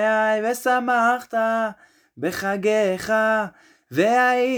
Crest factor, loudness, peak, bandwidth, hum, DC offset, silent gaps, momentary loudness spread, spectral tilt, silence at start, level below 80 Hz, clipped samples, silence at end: 14 dB; -21 LUFS; -6 dBFS; over 20 kHz; none; under 0.1%; none; 10 LU; -4.5 dB/octave; 0 s; -64 dBFS; under 0.1%; 0 s